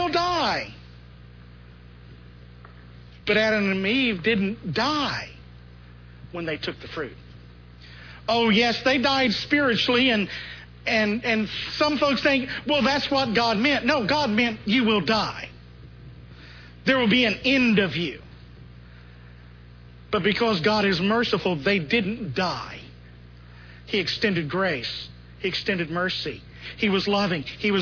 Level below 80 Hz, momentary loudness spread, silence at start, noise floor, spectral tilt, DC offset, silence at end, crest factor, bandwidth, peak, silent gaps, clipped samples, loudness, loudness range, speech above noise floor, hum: -50 dBFS; 14 LU; 0 s; -46 dBFS; -5 dB/octave; under 0.1%; 0 s; 18 dB; 5.4 kHz; -6 dBFS; none; under 0.1%; -23 LUFS; 6 LU; 23 dB; 60 Hz at -45 dBFS